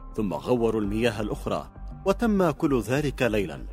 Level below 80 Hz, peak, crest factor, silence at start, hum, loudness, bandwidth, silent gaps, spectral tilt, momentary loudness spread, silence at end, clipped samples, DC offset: -40 dBFS; -8 dBFS; 18 dB; 0 s; none; -26 LUFS; 16 kHz; none; -6.5 dB/octave; 8 LU; 0 s; under 0.1%; under 0.1%